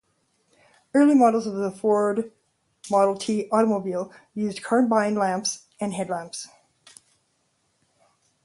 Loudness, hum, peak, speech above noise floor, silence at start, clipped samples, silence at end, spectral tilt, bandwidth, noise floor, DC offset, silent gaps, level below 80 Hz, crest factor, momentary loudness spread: -23 LUFS; none; -8 dBFS; 48 dB; 0.95 s; under 0.1%; 2 s; -5 dB/octave; 11.5 kHz; -70 dBFS; under 0.1%; none; -72 dBFS; 18 dB; 15 LU